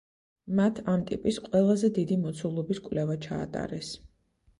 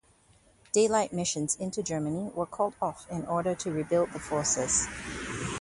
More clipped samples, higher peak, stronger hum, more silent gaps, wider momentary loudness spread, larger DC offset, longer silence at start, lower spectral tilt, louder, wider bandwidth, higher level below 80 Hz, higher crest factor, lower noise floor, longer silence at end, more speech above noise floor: neither; about the same, -12 dBFS vs -12 dBFS; neither; neither; about the same, 10 LU vs 9 LU; neither; second, 0.45 s vs 0.75 s; first, -7 dB/octave vs -4 dB/octave; about the same, -29 LUFS vs -30 LUFS; about the same, 11 kHz vs 11.5 kHz; about the same, -58 dBFS vs -54 dBFS; about the same, 18 dB vs 18 dB; first, -67 dBFS vs -62 dBFS; first, 0.55 s vs 0 s; first, 39 dB vs 33 dB